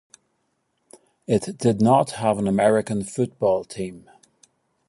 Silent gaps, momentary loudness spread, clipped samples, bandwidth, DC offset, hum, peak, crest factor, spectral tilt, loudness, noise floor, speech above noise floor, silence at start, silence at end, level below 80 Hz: none; 14 LU; under 0.1%; 11.5 kHz; under 0.1%; none; -4 dBFS; 20 dB; -6.5 dB/octave; -22 LUFS; -72 dBFS; 51 dB; 1.3 s; 0.9 s; -58 dBFS